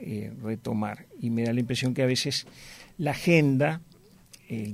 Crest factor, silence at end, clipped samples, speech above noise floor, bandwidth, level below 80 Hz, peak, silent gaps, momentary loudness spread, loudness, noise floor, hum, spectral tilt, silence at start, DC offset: 18 dB; 0 s; under 0.1%; 27 dB; 16 kHz; -60 dBFS; -10 dBFS; none; 16 LU; -27 LUFS; -54 dBFS; none; -5.5 dB/octave; 0 s; under 0.1%